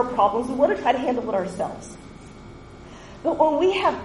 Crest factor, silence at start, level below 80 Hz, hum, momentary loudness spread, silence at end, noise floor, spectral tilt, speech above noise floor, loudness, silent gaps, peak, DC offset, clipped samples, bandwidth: 20 dB; 0 s; -50 dBFS; none; 23 LU; 0 s; -42 dBFS; -5.5 dB/octave; 20 dB; -22 LUFS; none; -4 dBFS; under 0.1%; under 0.1%; 11.5 kHz